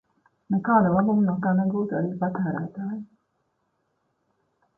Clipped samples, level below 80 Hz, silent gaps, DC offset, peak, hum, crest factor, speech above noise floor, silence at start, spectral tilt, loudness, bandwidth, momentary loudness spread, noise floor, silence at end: under 0.1%; -60 dBFS; none; under 0.1%; -8 dBFS; none; 18 dB; 50 dB; 0.5 s; -13 dB/octave; -24 LUFS; 1.8 kHz; 12 LU; -73 dBFS; 1.75 s